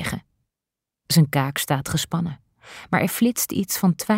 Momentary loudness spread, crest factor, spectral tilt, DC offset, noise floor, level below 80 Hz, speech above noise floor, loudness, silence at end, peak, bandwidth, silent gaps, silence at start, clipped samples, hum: 16 LU; 18 dB; -4.5 dB/octave; under 0.1%; -87 dBFS; -52 dBFS; 66 dB; -22 LUFS; 0 s; -6 dBFS; 16.5 kHz; none; 0 s; under 0.1%; none